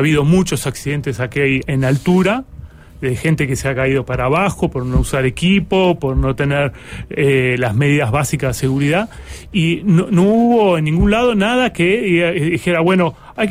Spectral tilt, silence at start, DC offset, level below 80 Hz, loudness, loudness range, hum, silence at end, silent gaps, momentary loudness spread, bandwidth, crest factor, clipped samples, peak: -6 dB/octave; 0 s; under 0.1%; -30 dBFS; -15 LUFS; 3 LU; none; 0 s; none; 7 LU; 16 kHz; 12 dB; under 0.1%; -4 dBFS